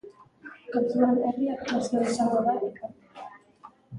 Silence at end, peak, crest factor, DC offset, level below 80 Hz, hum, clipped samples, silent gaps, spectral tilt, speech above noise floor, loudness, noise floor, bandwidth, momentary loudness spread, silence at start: 0 s; -10 dBFS; 18 dB; under 0.1%; -68 dBFS; none; under 0.1%; none; -5.5 dB/octave; 28 dB; -26 LUFS; -53 dBFS; 11.5 kHz; 22 LU; 0.05 s